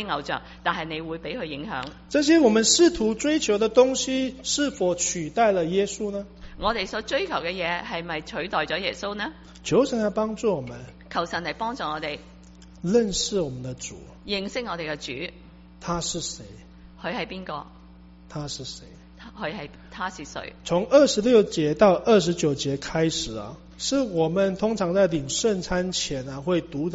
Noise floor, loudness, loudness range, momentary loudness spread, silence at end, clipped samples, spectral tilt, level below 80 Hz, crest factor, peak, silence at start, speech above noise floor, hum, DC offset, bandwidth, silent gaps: -48 dBFS; -24 LUFS; 12 LU; 16 LU; 0 s; under 0.1%; -4 dB/octave; -48 dBFS; 20 dB; -4 dBFS; 0 s; 23 dB; none; under 0.1%; 8 kHz; none